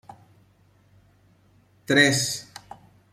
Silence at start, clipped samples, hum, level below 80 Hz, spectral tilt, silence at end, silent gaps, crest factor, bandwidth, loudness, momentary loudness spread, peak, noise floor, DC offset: 1.9 s; under 0.1%; none; -64 dBFS; -3 dB/octave; 0.7 s; none; 24 dB; 15.5 kHz; -21 LUFS; 25 LU; -4 dBFS; -60 dBFS; under 0.1%